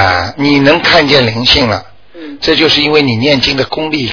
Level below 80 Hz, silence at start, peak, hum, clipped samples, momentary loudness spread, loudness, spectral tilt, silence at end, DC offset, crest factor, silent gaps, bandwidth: -34 dBFS; 0 s; 0 dBFS; none; 0.8%; 8 LU; -9 LUFS; -5 dB/octave; 0 s; 0.7%; 10 dB; none; 5.4 kHz